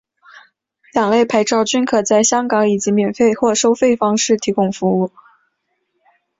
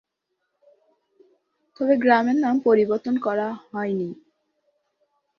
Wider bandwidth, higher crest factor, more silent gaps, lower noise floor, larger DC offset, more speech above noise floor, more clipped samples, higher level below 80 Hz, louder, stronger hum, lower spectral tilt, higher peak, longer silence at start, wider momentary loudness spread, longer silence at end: first, 7.8 kHz vs 6.4 kHz; second, 14 dB vs 22 dB; neither; second, -69 dBFS vs -78 dBFS; neither; about the same, 54 dB vs 57 dB; neither; first, -58 dBFS vs -70 dBFS; first, -15 LUFS vs -22 LUFS; neither; second, -4 dB/octave vs -7.5 dB/octave; about the same, -2 dBFS vs -4 dBFS; second, 0.95 s vs 1.8 s; second, 4 LU vs 11 LU; about the same, 1.3 s vs 1.25 s